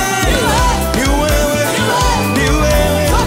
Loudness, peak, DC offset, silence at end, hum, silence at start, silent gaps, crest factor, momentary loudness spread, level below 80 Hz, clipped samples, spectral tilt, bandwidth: -13 LUFS; -2 dBFS; under 0.1%; 0 s; none; 0 s; none; 12 dB; 2 LU; -18 dBFS; under 0.1%; -4 dB/octave; 16.5 kHz